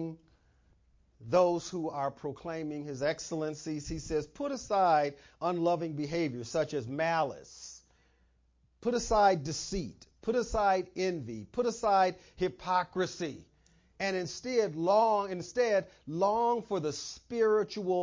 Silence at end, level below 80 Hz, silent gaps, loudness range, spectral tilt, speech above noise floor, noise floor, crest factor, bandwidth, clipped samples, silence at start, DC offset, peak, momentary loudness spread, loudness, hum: 0 s; -56 dBFS; none; 4 LU; -5 dB/octave; 38 dB; -69 dBFS; 18 dB; 7.6 kHz; under 0.1%; 0 s; under 0.1%; -14 dBFS; 12 LU; -32 LUFS; none